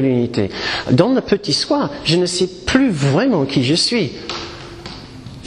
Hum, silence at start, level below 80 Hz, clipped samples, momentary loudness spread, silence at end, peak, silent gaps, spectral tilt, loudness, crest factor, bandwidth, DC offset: none; 0 s; -42 dBFS; under 0.1%; 17 LU; 0 s; 0 dBFS; none; -5 dB/octave; -17 LUFS; 16 dB; 11 kHz; under 0.1%